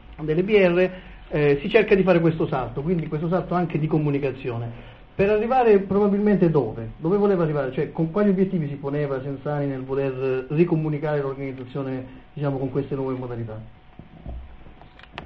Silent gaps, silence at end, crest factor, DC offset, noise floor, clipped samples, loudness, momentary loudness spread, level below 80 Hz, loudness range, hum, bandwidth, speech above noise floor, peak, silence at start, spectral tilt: none; 0 s; 20 dB; under 0.1%; -45 dBFS; under 0.1%; -23 LUFS; 15 LU; -46 dBFS; 8 LU; none; 5.8 kHz; 23 dB; -2 dBFS; 0.1 s; -10 dB/octave